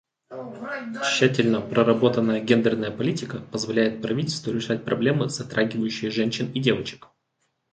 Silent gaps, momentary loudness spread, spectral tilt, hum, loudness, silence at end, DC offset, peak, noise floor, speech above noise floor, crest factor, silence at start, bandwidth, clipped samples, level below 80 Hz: none; 12 LU; -5.5 dB/octave; none; -24 LUFS; 0.75 s; under 0.1%; -4 dBFS; -74 dBFS; 50 dB; 20 dB; 0.3 s; 9.2 kHz; under 0.1%; -62 dBFS